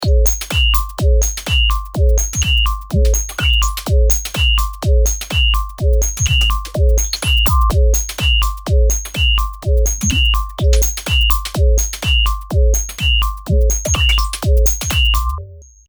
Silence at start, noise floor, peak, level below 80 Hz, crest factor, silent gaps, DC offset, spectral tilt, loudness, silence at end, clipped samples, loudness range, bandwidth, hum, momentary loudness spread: 0 s; -34 dBFS; 0 dBFS; -16 dBFS; 14 dB; none; under 0.1%; -3 dB/octave; -15 LUFS; 0.25 s; under 0.1%; 1 LU; over 20 kHz; none; 3 LU